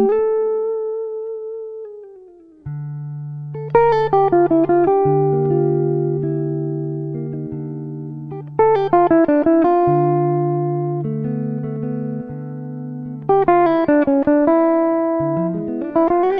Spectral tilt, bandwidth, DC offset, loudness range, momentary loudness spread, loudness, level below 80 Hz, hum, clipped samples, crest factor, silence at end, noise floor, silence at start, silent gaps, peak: -11 dB/octave; 5.2 kHz; under 0.1%; 6 LU; 15 LU; -17 LUFS; -50 dBFS; none; under 0.1%; 16 dB; 0 s; -44 dBFS; 0 s; none; -2 dBFS